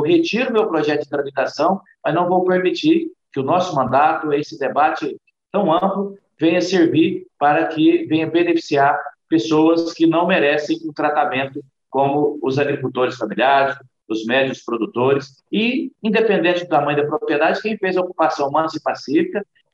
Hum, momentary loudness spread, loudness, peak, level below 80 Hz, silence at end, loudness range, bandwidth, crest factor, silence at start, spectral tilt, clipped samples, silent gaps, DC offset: none; 9 LU; -18 LUFS; -4 dBFS; -66 dBFS; 0.3 s; 2 LU; 7.6 kHz; 14 dB; 0 s; -6 dB/octave; under 0.1%; none; under 0.1%